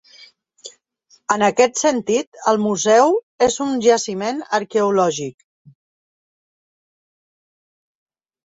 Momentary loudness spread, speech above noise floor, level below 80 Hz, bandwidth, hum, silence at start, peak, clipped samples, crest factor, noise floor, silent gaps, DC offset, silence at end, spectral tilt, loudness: 15 LU; 40 dB; -62 dBFS; 8 kHz; none; 0.65 s; -2 dBFS; under 0.1%; 18 dB; -58 dBFS; 2.27-2.32 s, 3.23-3.39 s; under 0.1%; 3.15 s; -3.5 dB/octave; -18 LUFS